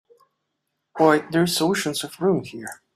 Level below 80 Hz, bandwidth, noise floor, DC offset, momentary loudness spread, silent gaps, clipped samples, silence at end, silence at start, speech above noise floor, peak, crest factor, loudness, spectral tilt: -66 dBFS; 15.5 kHz; -78 dBFS; under 0.1%; 17 LU; none; under 0.1%; 0.2 s; 0.95 s; 56 dB; -4 dBFS; 20 dB; -21 LUFS; -4.5 dB/octave